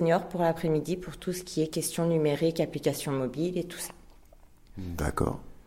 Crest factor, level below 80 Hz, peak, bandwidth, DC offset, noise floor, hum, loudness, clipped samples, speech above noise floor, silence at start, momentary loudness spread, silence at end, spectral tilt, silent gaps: 18 dB; -48 dBFS; -12 dBFS; 16.5 kHz; under 0.1%; -54 dBFS; none; -30 LUFS; under 0.1%; 25 dB; 0 s; 11 LU; 0.1 s; -5.5 dB/octave; none